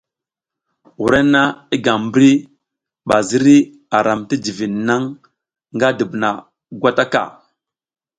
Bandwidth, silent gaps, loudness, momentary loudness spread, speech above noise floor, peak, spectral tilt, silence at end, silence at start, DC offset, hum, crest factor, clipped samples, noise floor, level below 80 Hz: 9.4 kHz; none; -16 LUFS; 10 LU; 71 dB; 0 dBFS; -5 dB/octave; 0.9 s; 1 s; under 0.1%; none; 16 dB; under 0.1%; -86 dBFS; -52 dBFS